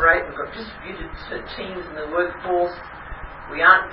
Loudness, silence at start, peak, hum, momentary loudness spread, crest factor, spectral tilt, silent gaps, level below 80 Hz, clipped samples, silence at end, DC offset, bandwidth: -22 LUFS; 0 s; 0 dBFS; none; 19 LU; 22 dB; -9 dB/octave; none; -42 dBFS; under 0.1%; 0 s; under 0.1%; 5.6 kHz